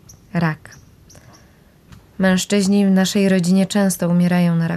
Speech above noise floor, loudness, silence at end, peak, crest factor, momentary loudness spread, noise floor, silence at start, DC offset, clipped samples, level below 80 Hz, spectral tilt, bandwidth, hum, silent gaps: 33 dB; -17 LUFS; 0 s; -6 dBFS; 12 dB; 6 LU; -49 dBFS; 0.35 s; under 0.1%; under 0.1%; -52 dBFS; -6 dB/octave; 14 kHz; none; none